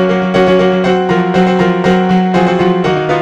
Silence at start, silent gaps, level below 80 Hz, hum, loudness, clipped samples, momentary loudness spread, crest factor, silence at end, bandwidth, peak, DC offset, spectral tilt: 0 s; none; -40 dBFS; none; -11 LUFS; under 0.1%; 2 LU; 10 dB; 0 s; 8.2 kHz; 0 dBFS; under 0.1%; -7.5 dB/octave